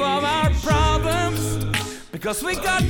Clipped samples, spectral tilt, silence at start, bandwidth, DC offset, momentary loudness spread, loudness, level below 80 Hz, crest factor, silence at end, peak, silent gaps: under 0.1%; -4.5 dB/octave; 0 s; 19.5 kHz; under 0.1%; 7 LU; -22 LUFS; -28 dBFS; 14 dB; 0 s; -6 dBFS; none